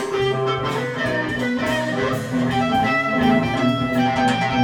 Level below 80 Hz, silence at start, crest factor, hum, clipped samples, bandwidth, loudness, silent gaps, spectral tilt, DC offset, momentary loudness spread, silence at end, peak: -46 dBFS; 0 s; 14 dB; none; under 0.1%; 18 kHz; -20 LUFS; none; -6 dB/octave; under 0.1%; 4 LU; 0 s; -6 dBFS